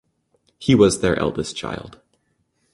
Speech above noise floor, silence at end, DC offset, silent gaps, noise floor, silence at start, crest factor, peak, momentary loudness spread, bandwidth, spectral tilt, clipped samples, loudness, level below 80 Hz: 49 dB; 0.85 s; under 0.1%; none; -68 dBFS; 0.6 s; 20 dB; -2 dBFS; 15 LU; 12 kHz; -5.5 dB/octave; under 0.1%; -19 LUFS; -46 dBFS